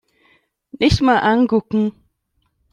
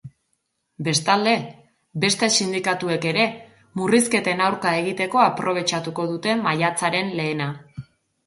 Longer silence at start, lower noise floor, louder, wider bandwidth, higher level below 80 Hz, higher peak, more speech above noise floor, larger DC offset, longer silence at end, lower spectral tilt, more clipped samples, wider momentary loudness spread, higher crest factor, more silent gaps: first, 0.75 s vs 0.05 s; second, -68 dBFS vs -73 dBFS; first, -17 LUFS vs -21 LUFS; about the same, 11 kHz vs 12 kHz; first, -38 dBFS vs -64 dBFS; about the same, -2 dBFS vs -2 dBFS; about the same, 52 dB vs 52 dB; neither; first, 0.85 s vs 0.45 s; first, -6 dB/octave vs -3.5 dB/octave; neither; second, 7 LU vs 11 LU; about the same, 16 dB vs 20 dB; neither